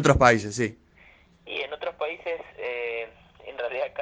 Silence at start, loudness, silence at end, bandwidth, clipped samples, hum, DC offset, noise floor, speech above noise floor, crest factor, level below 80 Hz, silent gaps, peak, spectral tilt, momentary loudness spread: 0 s; -27 LUFS; 0 s; 9.8 kHz; under 0.1%; none; under 0.1%; -56 dBFS; 33 dB; 24 dB; -44 dBFS; none; -2 dBFS; -5 dB/octave; 16 LU